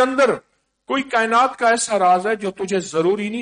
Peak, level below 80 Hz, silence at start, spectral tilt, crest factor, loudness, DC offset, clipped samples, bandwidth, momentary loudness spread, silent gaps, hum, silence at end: -6 dBFS; -62 dBFS; 0 s; -3.5 dB/octave; 14 dB; -19 LUFS; under 0.1%; under 0.1%; 10 kHz; 8 LU; none; none; 0 s